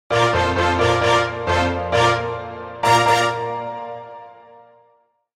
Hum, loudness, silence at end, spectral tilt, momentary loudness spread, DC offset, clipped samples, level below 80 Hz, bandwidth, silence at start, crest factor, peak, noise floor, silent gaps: none; -18 LUFS; 1.05 s; -4.5 dB/octave; 15 LU; under 0.1%; under 0.1%; -42 dBFS; 15.5 kHz; 0.1 s; 16 dB; -4 dBFS; -60 dBFS; none